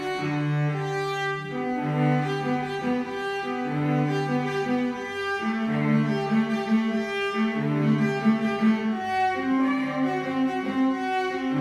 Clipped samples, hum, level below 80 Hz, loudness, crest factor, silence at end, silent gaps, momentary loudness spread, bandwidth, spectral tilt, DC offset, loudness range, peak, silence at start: under 0.1%; none; -64 dBFS; -25 LUFS; 14 dB; 0 s; none; 5 LU; 11.5 kHz; -7 dB/octave; under 0.1%; 3 LU; -10 dBFS; 0 s